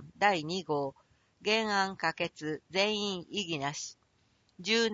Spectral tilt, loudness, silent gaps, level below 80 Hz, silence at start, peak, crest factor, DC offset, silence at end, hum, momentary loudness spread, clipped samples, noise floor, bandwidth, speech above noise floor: -3.5 dB/octave; -32 LUFS; none; -72 dBFS; 0 s; -12 dBFS; 22 dB; under 0.1%; 0 s; none; 11 LU; under 0.1%; -70 dBFS; 8 kHz; 39 dB